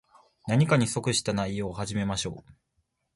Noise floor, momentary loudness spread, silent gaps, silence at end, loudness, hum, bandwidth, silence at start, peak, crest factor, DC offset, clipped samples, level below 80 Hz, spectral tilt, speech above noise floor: -76 dBFS; 12 LU; none; 0.65 s; -27 LUFS; none; 11.5 kHz; 0.45 s; -8 dBFS; 20 dB; under 0.1%; under 0.1%; -52 dBFS; -5 dB/octave; 49 dB